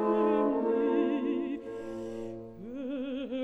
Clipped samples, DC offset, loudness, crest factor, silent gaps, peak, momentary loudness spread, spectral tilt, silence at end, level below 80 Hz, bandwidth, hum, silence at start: under 0.1%; under 0.1%; -31 LUFS; 14 dB; none; -16 dBFS; 14 LU; -7.5 dB/octave; 0 s; -64 dBFS; 8.2 kHz; none; 0 s